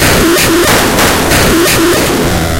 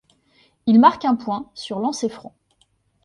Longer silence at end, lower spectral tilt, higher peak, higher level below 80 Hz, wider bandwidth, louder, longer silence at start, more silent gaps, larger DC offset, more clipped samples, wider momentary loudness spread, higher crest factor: second, 0 s vs 0.85 s; second, -3.5 dB/octave vs -5.5 dB/octave; about the same, 0 dBFS vs 0 dBFS; first, -22 dBFS vs -64 dBFS; first, 17.5 kHz vs 11 kHz; first, -7 LUFS vs -19 LUFS; second, 0 s vs 0.65 s; neither; neither; first, 0.3% vs under 0.1%; second, 3 LU vs 15 LU; second, 8 dB vs 20 dB